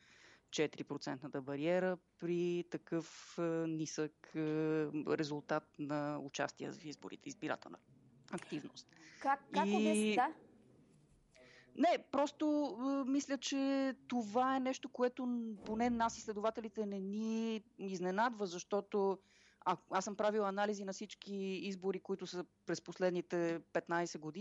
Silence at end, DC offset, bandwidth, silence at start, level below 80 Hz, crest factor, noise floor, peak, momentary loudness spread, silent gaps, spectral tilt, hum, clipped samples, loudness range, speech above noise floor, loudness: 0 s; under 0.1%; 11 kHz; 0.5 s; -76 dBFS; 18 dB; -69 dBFS; -22 dBFS; 11 LU; none; -5 dB/octave; none; under 0.1%; 4 LU; 30 dB; -39 LUFS